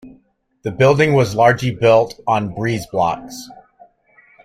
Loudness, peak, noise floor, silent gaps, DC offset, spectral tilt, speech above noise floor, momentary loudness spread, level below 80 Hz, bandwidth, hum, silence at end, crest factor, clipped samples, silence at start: -16 LUFS; -2 dBFS; -56 dBFS; none; under 0.1%; -6 dB/octave; 40 dB; 15 LU; -50 dBFS; 15.5 kHz; none; 0.9 s; 16 dB; under 0.1%; 0.05 s